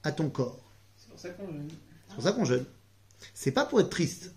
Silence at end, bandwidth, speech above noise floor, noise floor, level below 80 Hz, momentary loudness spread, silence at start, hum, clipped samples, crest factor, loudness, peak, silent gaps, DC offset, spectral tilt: 0.05 s; 15 kHz; 27 dB; -57 dBFS; -64 dBFS; 20 LU; 0.05 s; none; under 0.1%; 20 dB; -30 LUFS; -12 dBFS; none; under 0.1%; -5.5 dB/octave